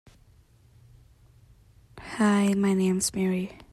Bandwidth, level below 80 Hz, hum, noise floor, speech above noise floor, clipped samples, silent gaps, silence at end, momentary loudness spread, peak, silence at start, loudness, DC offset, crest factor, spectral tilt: 13.5 kHz; -58 dBFS; none; -58 dBFS; 34 dB; under 0.1%; none; 0.2 s; 12 LU; -12 dBFS; 1.95 s; -25 LUFS; under 0.1%; 16 dB; -5.5 dB/octave